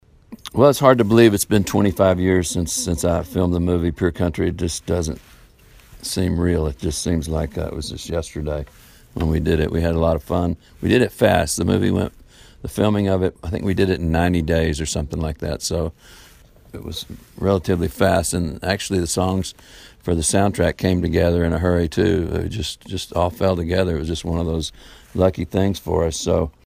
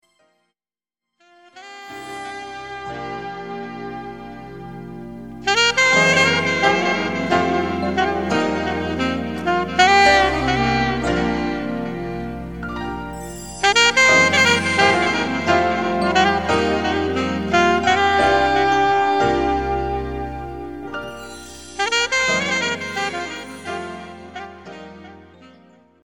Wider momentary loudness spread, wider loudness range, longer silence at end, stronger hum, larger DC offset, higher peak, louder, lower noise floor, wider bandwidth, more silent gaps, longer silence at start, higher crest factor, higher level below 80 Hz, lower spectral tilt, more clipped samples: second, 11 LU vs 21 LU; second, 6 LU vs 16 LU; second, 0.15 s vs 0.55 s; neither; second, under 0.1% vs 0.5%; about the same, 0 dBFS vs 0 dBFS; second, -20 LUFS vs -17 LUFS; second, -48 dBFS vs under -90 dBFS; second, 15.5 kHz vs 17.5 kHz; neither; second, 0.3 s vs 1.55 s; about the same, 20 dB vs 20 dB; first, -34 dBFS vs -42 dBFS; first, -5.5 dB/octave vs -3.5 dB/octave; neither